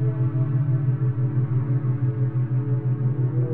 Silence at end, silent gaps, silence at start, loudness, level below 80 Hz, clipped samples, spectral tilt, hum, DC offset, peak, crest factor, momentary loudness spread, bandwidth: 0 s; none; 0 s; -23 LUFS; -62 dBFS; under 0.1%; -12.5 dB/octave; none; 0.9%; -12 dBFS; 8 dB; 2 LU; 2.5 kHz